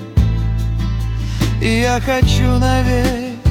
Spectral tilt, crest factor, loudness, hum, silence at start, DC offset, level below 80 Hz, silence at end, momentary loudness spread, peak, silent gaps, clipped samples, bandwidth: -6 dB/octave; 12 dB; -16 LUFS; none; 0 s; under 0.1%; -20 dBFS; 0 s; 6 LU; -2 dBFS; none; under 0.1%; 16.5 kHz